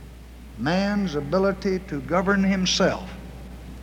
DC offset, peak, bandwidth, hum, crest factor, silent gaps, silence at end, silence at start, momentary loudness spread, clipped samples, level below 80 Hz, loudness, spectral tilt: under 0.1%; -8 dBFS; 11.5 kHz; none; 16 dB; none; 0 s; 0 s; 20 LU; under 0.1%; -42 dBFS; -23 LUFS; -5 dB/octave